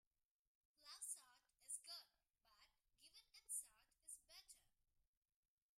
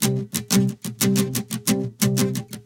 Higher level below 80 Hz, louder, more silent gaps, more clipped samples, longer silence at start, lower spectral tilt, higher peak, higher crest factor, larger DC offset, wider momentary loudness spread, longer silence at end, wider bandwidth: second, under -90 dBFS vs -54 dBFS; second, -55 LUFS vs -22 LUFS; neither; neither; first, 0.8 s vs 0 s; second, 3.5 dB/octave vs -4.5 dB/octave; second, -38 dBFS vs -4 dBFS; about the same, 24 dB vs 20 dB; neither; first, 17 LU vs 5 LU; first, 1.15 s vs 0.05 s; about the same, 16 kHz vs 17.5 kHz